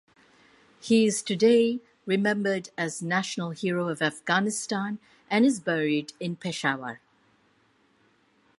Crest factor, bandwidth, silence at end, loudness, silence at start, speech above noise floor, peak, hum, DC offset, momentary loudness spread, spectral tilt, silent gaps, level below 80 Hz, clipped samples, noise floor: 20 dB; 11.5 kHz; 1.6 s; -26 LUFS; 0.85 s; 39 dB; -8 dBFS; none; under 0.1%; 12 LU; -4.5 dB/octave; none; -74 dBFS; under 0.1%; -65 dBFS